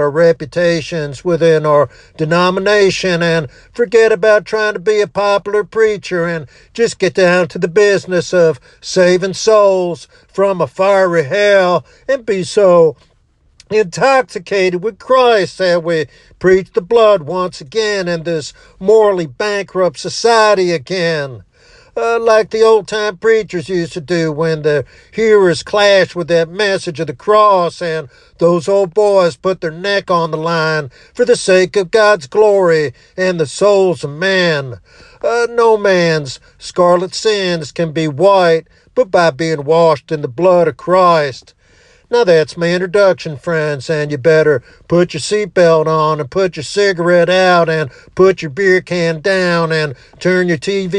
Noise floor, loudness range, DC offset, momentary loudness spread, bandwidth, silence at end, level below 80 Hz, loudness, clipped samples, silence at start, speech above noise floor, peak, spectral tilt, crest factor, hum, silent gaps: -53 dBFS; 2 LU; under 0.1%; 9 LU; 10.5 kHz; 0 s; -50 dBFS; -13 LUFS; under 0.1%; 0 s; 41 dB; 0 dBFS; -5 dB/octave; 12 dB; none; none